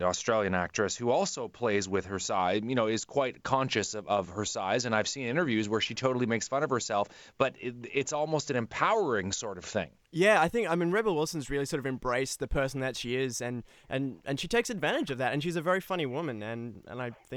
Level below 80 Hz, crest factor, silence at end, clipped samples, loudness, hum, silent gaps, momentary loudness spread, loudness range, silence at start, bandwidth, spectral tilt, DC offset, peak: -52 dBFS; 20 dB; 0 s; under 0.1%; -30 LUFS; none; none; 7 LU; 3 LU; 0 s; 18 kHz; -4 dB/octave; under 0.1%; -10 dBFS